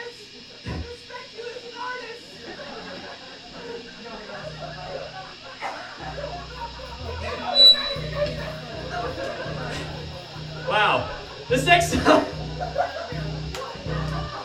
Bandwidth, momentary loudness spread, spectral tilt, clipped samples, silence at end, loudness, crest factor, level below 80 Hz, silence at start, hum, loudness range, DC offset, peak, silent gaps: 19.5 kHz; 20 LU; -4 dB/octave; under 0.1%; 0 s; -23 LUFS; 24 dB; -44 dBFS; 0 s; none; 15 LU; under 0.1%; -2 dBFS; none